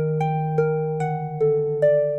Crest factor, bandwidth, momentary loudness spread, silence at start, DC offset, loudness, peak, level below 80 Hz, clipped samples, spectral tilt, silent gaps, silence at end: 14 dB; 8.4 kHz; 6 LU; 0 s; 0.1%; -22 LUFS; -8 dBFS; -64 dBFS; under 0.1%; -9.5 dB/octave; none; 0 s